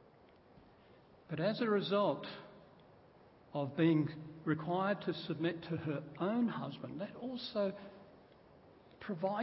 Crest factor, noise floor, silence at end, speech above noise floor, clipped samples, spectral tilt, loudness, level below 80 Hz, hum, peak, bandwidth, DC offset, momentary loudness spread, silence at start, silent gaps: 18 dB; -63 dBFS; 0 s; 27 dB; under 0.1%; -5.5 dB/octave; -37 LUFS; -74 dBFS; none; -20 dBFS; 5.6 kHz; under 0.1%; 14 LU; 1.3 s; none